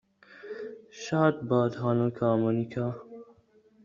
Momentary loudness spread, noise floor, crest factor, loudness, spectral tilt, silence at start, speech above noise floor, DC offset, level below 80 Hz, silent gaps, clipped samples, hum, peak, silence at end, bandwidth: 17 LU; -61 dBFS; 20 dB; -28 LUFS; -7.5 dB/octave; 0.3 s; 35 dB; under 0.1%; -68 dBFS; none; under 0.1%; none; -10 dBFS; 0.6 s; 7.4 kHz